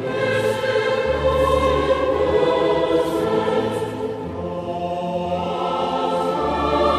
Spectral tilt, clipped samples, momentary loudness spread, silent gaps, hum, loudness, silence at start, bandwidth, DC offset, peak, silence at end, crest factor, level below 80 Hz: -6 dB/octave; under 0.1%; 8 LU; none; none; -21 LUFS; 0 s; 14 kHz; under 0.1%; -6 dBFS; 0 s; 14 dB; -38 dBFS